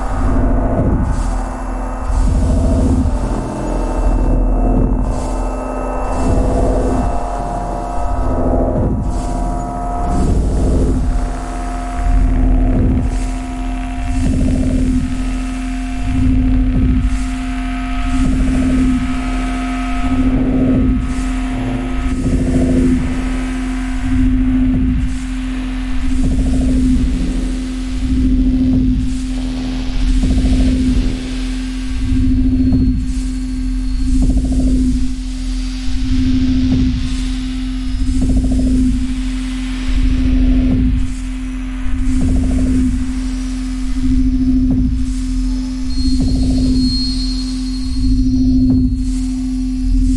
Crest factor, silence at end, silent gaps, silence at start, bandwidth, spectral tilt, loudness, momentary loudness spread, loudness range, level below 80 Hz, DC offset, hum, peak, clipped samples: 12 dB; 0 s; none; 0 s; 11.5 kHz; -7 dB/octave; -17 LUFS; 8 LU; 2 LU; -18 dBFS; under 0.1%; none; -2 dBFS; under 0.1%